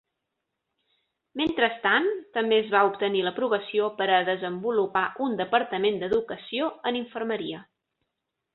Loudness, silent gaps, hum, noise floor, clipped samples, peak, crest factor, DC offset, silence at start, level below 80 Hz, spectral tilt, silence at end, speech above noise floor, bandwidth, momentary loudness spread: -26 LUFS; none; none; -83 dBFS; under 0.1%; -6 dBFS; 20 dB; under 0.1%; 1.35 s; -66 dBFS; -7 dB/octave; 0.9 s; 57 dB; 4.3 kHz; 8 LU